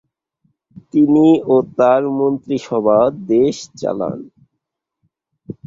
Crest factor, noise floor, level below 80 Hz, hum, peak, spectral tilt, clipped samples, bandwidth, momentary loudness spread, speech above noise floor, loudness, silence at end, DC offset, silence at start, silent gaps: 14 dB; -77 dBFS; -58 dBFS; none; -2 dBFS; -7 dB/octave; under 0.1%; 7.6 kHz; 12 LU; 62 dB; -15 LUFS; 0.15 s; under 0.1%; 0.75 s; none